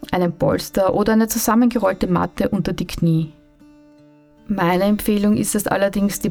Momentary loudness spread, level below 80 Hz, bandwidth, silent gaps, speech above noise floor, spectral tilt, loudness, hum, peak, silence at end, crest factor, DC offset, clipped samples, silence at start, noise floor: 5 LU; -42 dBFS; 18.5 kHz; none; 31 dB; -5.5 dB/octave; -19 LUFS; none; -4 dBFS; 0 s; 14 dB; under 0.1%; under 0.1%; 0 s; -49 dBFS